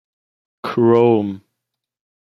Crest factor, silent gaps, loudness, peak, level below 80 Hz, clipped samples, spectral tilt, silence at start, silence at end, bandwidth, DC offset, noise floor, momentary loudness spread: 18 dB; none; -16 LUFS; -2 dBFS; -66 dBFS; under 0.1%; -9 dB/octave; 0.65 s; 0.85 s; 6 kHz; under 0.1%; -80 dBFS; 17 LU